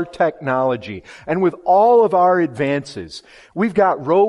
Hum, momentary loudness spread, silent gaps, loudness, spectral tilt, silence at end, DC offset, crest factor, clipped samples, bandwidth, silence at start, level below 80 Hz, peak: none; 20 LU; none; -17 LUFS; -7 dB/octave; 0 s; under 0.1%; 14 dB; under 0.1%; 11.5 kHz; 0 s; -58 dBFS; -4 dBFS